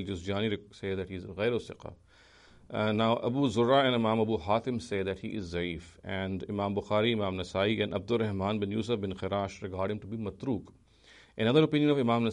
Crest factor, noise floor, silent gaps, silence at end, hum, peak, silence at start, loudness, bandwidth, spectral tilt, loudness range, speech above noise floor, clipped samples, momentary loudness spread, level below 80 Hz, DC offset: 20 dB; -58 dBFS; none; 0 s; none; -12 dBFS; 0 s; -30 LUFS; 10.5 kHz; -6.5 dB/octave; 4 LU; 28 dB; under 0.1%; 12 LU; -58 dBFS; under 0.1%